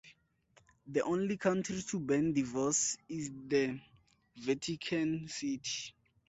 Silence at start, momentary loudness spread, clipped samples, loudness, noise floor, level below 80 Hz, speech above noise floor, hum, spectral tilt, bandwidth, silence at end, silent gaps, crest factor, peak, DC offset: 0.05 s; 9 LU; under 0.1%; -35 LUFS; -69 dBFS; -70 dBFS; 35 dB; none; -4 dB/octave; 8.2 kHz; 0.4 s; none; 18 dB; -18 dBFS; under 0.1%